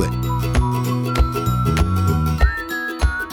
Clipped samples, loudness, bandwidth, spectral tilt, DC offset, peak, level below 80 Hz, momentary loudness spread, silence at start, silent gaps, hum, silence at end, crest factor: under 0.1%; -20 LUFS; 18.5 kHz; -6 dB/octave; under 0.1%; -4 dBFS; -22 dBFS; 4 LU; 0 s; none; none; 0 s; 14 dB